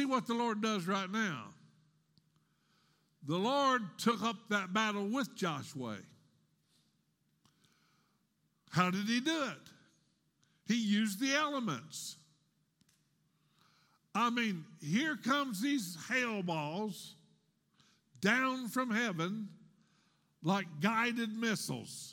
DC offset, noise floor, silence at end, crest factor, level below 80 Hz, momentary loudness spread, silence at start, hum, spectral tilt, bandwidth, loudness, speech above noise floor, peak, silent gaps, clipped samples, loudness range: under 0.1%; -78 dBFS; 0 s; 24 dB; -86 dBFS; 12 LU; 0 s; none; -4.5 dB/octave; 17 kHz; -35 LUFS; 43 dB; -14 dBFS; none; under 0.1%; 5 LU